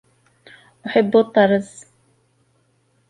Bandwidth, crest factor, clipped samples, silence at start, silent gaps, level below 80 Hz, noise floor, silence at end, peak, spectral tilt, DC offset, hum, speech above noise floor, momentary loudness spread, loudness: 11 kHz; 18 dB; under 0.1%; 0.85 s; none; -64 dBFS; -63 dBFS; 1.45 s; -2 dBFS; -6 dB/octave; under 0.1%; none; 46 dB; 18 LU; -17 LUFS